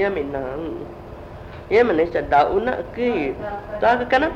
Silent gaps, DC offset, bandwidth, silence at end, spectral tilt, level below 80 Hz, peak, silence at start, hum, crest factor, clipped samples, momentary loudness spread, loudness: none; under 0.1%; 8 kHz; 0 s; -7 dB/octave; -42 dBFS; -4 dBFS; 0 s; none; 16 dB; under 0.1%; 20 LU; -21 LUFS